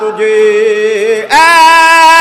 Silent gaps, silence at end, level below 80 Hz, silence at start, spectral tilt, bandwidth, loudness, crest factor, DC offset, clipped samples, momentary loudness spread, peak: none; 0 s; -46 dBFS; 0 s; -1 dB/octave; 16.5 kHz; -6 LUFS; 6 dB; under 0.1%; 1%; 8 LU; 0 dBFS